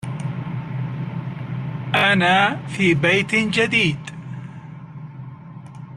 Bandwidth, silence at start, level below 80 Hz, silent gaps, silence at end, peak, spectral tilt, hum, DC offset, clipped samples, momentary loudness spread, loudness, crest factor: 12.5 kHz; 0 s; -56 dBFS; none; 0 s; -4 dBFS; -5.5 dB/octave; none; under 0.1%; under 0.1%; 22 LU; -19 LUFS; 18 dB